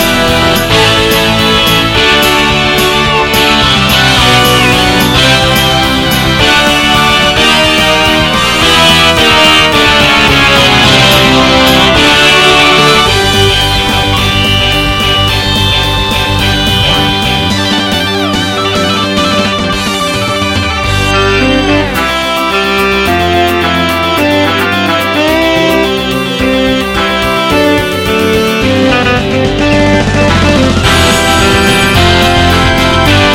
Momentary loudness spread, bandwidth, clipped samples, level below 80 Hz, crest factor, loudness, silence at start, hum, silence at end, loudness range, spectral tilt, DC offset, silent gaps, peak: 6 LU; 17.5 kHz; 0.5%; -22 dBFS; 8 dB; -7 LUFS; 0 s; none; 0 s; 5 LU; -4 dB/octave; under 0.1%; none; 0 dBFS